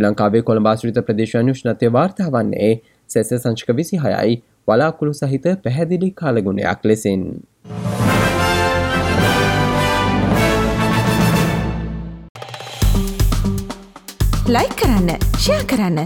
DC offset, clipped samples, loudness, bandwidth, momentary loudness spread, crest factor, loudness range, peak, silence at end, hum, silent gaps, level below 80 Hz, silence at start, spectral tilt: under 0.1%; under 0.1%; -17 LUFS; 19.5 kHz; 9 LU; 14 dB; 4 LU; -2 dBFS; 0 s; none; 12.29-12.35 s; -28 dBFS; 0 s; -6 dB/octave